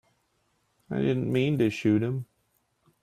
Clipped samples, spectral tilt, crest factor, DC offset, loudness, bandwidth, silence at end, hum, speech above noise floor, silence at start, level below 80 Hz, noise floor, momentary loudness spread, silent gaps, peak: under 0.1%; -8 dB/octave; 16 dB; under 0.1%; -27 LUFS; 14 kHz; 0.8 s; none; 47 dB; 0.9 s; -64 dBFS; -72 dBFS; 11 LU; none; -12 dBFS